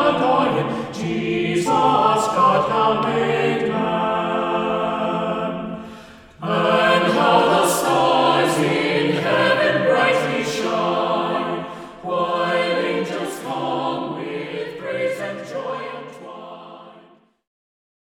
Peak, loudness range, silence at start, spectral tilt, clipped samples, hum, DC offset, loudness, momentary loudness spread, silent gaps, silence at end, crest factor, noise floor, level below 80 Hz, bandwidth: -2 dBFS; 10 LU; 0 s; -4.5 dB/octave; under 0.1%; none; under 0.1%; -19 LUFS; 13 LU; none; 1.15 s; 18 dB; -51 dBFS; -56 dBFS; 19 kHz